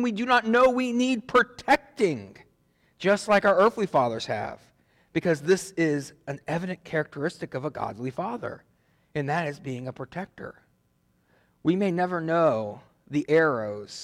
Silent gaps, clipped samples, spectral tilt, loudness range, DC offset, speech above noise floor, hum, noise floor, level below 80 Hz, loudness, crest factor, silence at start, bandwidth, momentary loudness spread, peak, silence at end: none; under 0.1%; -5.5 dB/octave; 9 LU; under 0.1%; 43 dB; none; -68 dBFS; -62 dBFS; -25 LUFS; 16 dB; 0 s; 14.5 kHz; 15 LU; -10 dBFS; 0 s